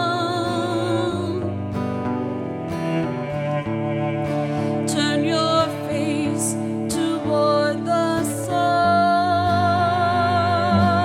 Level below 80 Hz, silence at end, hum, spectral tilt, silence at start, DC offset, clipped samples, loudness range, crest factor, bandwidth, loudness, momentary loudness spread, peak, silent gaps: -54 dBFS; 0 s; none; -5.5 dB/octave; 0 s; under 0.1%; under 0.1%; 6 LU; 16 dB; 16 kHz; -21 LUFS; 7 LU; -6 dBFS; none